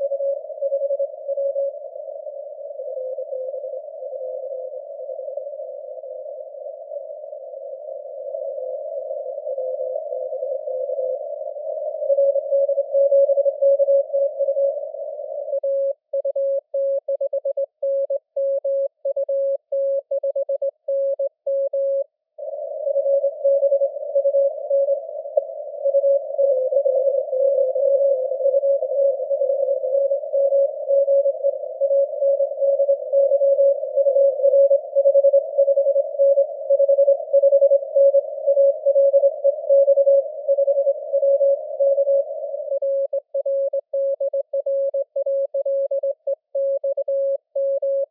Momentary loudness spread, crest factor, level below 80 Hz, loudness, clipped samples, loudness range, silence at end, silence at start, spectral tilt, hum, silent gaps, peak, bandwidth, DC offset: 15 LU; 16 dB; under -90 dBFS; -21 LUFS; under 0.1%; 13 LU; 0.05 s; 0 s; -8.5 dB/octave; none; none; -4 dBFS; 0.8 kHz; under 0.1%